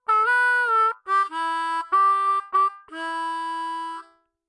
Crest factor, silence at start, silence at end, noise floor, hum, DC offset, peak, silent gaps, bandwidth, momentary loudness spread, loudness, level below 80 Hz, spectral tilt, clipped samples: 12 dB; 0.1 s; 0.45 s; -48 dBFS; none; under 0.1%; -12 dBFS; none; 11 kHz; 12 LU; -22 LUFS; -84 dBFS; 0.5 dB/octave; under 0.1%